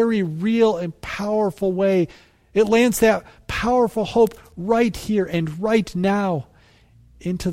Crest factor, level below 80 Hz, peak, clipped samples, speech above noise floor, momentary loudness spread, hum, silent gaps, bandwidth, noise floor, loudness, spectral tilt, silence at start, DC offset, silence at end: 16 dB; -46 dBFS; -4 dBFS; under 0.1%; 33 dB; 11 LU; none; none; 16 kHz; -52 dBFS; -20 LUFS; -6 dB/octave; 0 s; under 0.1%; 0 s